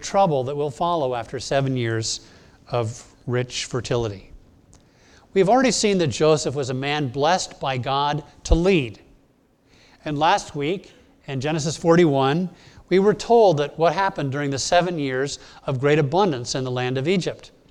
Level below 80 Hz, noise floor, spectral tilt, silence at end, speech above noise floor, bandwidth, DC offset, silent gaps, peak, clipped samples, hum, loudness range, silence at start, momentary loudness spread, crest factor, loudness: -40 dBFS; -59 dBFS; -5 dB/octave; 0.25 s; 38 dB; 11.5 kHz; under 0.1%; none; -2 dBFS; under 0.1%; none; 6 LU; 0 s; 12 LU; 20 dB; -22 LUFS